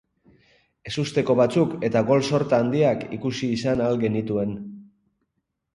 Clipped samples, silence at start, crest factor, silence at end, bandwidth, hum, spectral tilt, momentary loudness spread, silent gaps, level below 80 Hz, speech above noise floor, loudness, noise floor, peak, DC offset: under 0.1%; 0.85 s; 18 dB; 0.9 s; 11.5 kHz; none; -6.5 dB/octave; 10 LU; none; -56 dBFS; 56 dB; -23 LUFS; -77 dBFS; -6 dBFS; under 0.1%